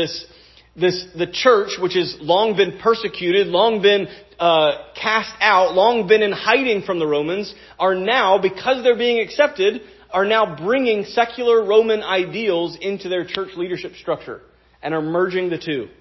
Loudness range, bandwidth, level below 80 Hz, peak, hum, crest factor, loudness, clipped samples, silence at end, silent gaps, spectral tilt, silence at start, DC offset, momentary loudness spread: 5 LU; 6.2 kHz; -56 dBFS; 0 dBFS; none; 18 dB; -18 LUFS; under 0.1%; 0.15 s; none; -5 dB/octave; 0 s; under 0.1%; 11 LU